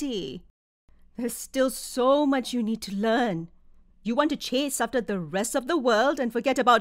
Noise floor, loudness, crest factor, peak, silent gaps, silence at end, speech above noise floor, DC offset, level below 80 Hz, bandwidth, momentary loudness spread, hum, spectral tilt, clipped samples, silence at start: -53 dBFS; -26 LUFS; 20 dB; -6 dBFS; 0.50-0.88 s; 0 s; 28 dB; under 0.1%; -56 dBFS; 16 kHz; 12 LU; none; -4 dB/octave; under 0.1%; 0 s